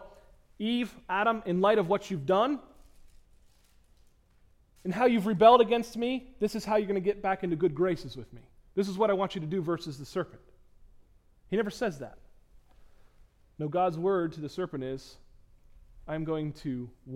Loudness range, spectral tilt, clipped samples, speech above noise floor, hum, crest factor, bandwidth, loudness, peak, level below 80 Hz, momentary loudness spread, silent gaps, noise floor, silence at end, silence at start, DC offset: 10 LU; -6.5 dB/octave; under 0.1%; 34 dB; none; 24 dB; 16 kHz; -29 LUFS; -6 dBFS; -58 dBFS; 12 LU; none; -62 dBFS; 0 s; 0 s; under 0.1%